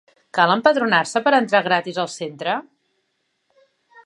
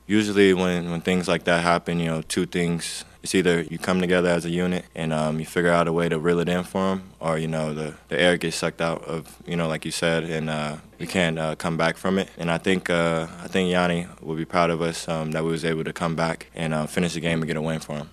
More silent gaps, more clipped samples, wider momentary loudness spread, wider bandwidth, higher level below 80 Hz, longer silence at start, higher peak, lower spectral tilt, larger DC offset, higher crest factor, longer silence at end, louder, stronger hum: neither; neither; first, 11 LU vs 8 LU; second, 11 kHz vs 13.5 kHz; second, -76 dBFS vs -52 dBFS; first, 0.35 s vs 0.1 s; about the same, 0 dBFS vs -2 dBFS; about the same, -4 dB/octave vs -5 dB/octave; neither; about the same, 20 dB vs 20 dB; first, 1.45 s vs 0.05 s; first, -19 LUFS vs -24 LUFS; neither